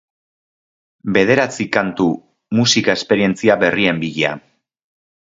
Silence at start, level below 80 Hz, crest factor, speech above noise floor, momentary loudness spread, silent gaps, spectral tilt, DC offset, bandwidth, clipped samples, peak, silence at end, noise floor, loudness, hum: 1.05 s; -54 dBFS; 18 dB; over 74 dB; 7 LU; none; -4.5 dB/octave; under 0.1%; 7.8 kHz; under 0.1%; 0 dBFS; 0.9 s; under -90 dBFS; -16 LUFS; none